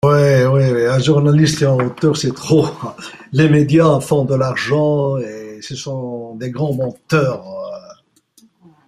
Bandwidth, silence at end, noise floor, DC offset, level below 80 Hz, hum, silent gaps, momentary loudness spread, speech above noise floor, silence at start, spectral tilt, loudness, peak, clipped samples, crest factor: 13 kHz; 0.95 s; -53 dBFS; under 0.1%; -50 dBFS; none; none; 17 LU; 38 dB; 0.05 s; -6.5 dB/octave; -15 LUFS; -2 dBFS; under 0.1%; 14 dB